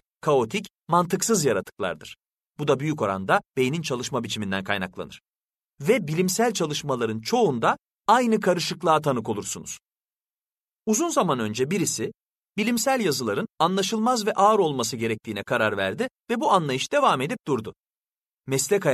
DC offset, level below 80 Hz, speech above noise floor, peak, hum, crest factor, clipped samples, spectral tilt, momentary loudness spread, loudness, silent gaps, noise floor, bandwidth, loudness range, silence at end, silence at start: under 0.1%; -64 dBFS; over 66 dB; -4 dBFS; none; 20 dB; under 0.1%; -4 dB/octave; 10 LU; -24 LUFS; 5.28-5.32 s; under -90 dBFS; 13.5 kHz; 3 LU; 0 s; 0.25 s